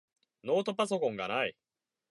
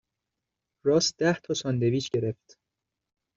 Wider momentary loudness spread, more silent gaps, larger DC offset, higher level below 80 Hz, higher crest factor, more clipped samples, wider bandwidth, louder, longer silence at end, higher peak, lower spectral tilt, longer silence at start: second, 5 LU vs 8 LU; neither; neither; second, -78 dBFS vs -66 dBFS; about the same, 18 dB vs 18 dB; neither; first, 11.5 kHz vs 7.8 kHz; second, -32 LUFS vs -27 LUFS; second, 0.6 s vs 1.05 s; second, -16 dBFS vs -10 dBFS; about the same, -4.5 dB/octave vs -5 dB/octave; second, 0.45 s vs 0.85 s